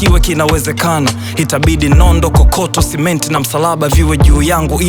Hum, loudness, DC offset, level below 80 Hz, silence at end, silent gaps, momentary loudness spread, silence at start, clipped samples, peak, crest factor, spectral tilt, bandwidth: none; -11 LUFS; under 0.1%; -14 dBFS; 0 s; none; 5 LU; 0 s; under 0.1%; 0 dBFS; 10 dB; -5 dB/octave; over 20 kHz